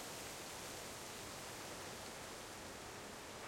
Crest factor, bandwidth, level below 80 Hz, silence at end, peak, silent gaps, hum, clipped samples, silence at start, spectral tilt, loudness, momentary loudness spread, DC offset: 14 dB; 16.5 kHz; -68 dBFS; 0 s; -36 dBFS; none; none; under 0.1%; 0 s; -2 dB/octave; -49 LUFS; 2 LU; under 0.1%